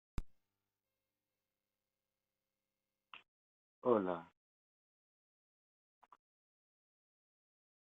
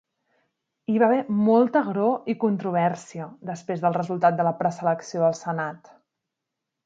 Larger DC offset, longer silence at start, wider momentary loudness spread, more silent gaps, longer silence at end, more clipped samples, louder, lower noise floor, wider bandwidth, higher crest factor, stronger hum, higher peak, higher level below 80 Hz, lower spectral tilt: neither; second, 0.2 s vs 0.9 s; first, 24 LU vs 14 LU; first, 3.28-3.82 s vs none; first, 3.7 s vs 1.1 s; neither; second, -38 LUFS vs -23 LUFS; first, under -90 dBFS vs -84 dBFS; about the same, 7.6 kHz vs 7.8 kHz; first, 30 dB vs 18 dB; first, 50 Hz at -80 dBFS vs none; second, -18 dBFS vs -6 dBFS; first, -62 dBFS vs -72 dBFS; about the same, -6.5 dB/octave vs -7.5 dB/octave